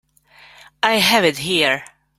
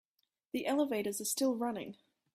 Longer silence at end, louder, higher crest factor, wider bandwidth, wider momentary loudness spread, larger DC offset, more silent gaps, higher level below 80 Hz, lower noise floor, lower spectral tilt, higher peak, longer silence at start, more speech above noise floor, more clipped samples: about the same, 0.35 s vs 0.4 s; first, -16 LUFS vs -35 LUFS; about the same, 18 dB vs 16 dB; about the same, 16.5 kHz vs 16 kHz; second, 7 LU vs 10 LU; neither; neither; first, -58 dBFS vs -80 dBFS; second, -49 dBFS vs -80 dBFS; about the same, -3 dB/octave vs -3 dB/octave; first, -2 dBFS vs -20 dBFS; first, 0.85 s vs 0.55 s; second, 32 dB vs 45 dB; neither